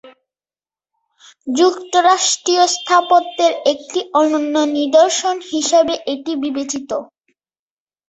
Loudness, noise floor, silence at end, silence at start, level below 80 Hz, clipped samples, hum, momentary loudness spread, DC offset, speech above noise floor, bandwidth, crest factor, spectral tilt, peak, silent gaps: -16 LUFS; under -90 dBFS; 1.05 s; 0.05 s; -64 dBFS; under 0.1%; none; 10 LU; under 0.1%; over 74 dB; 8.4 kHz; 16 dB; -1 dB/octave; -2 dBFS; none